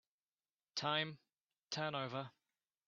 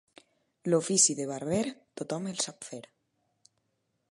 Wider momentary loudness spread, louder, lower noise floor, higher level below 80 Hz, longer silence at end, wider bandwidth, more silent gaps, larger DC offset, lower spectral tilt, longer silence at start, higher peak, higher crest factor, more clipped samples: second, 12 LU vs 20 LU; second, -42 LUFS vs -29 LUFS; first, under -90 dBFS vs -78 dBFS; second, -86 dBFS vs -72 dBFS; second, 0.6 s vs 1.35 s; second, 7.4 kHz vs 11.5 kHz; first, 1.41-1.47 s vs none; neither; second, -2 dB/octave vs -3.5 dB/octave; about the same, 0.75 s vs 0.65 s; second, -22 dBFS vs -10 dBFS; about the same, 22 dB vs 24 dB; neither